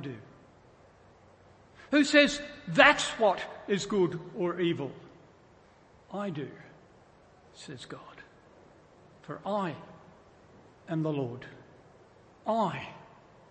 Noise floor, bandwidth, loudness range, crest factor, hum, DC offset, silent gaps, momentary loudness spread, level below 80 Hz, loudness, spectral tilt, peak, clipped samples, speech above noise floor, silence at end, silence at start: -59 dBFS; 8.8 kHz; 18 LU; 28 dB; none; under 0.1%; none; 24 LU; -66 dBFS; -28 LUFS; -4.5 dB/octave; -4 dBFS; under 0.1%; 30 dB; 0.45 s; 0 s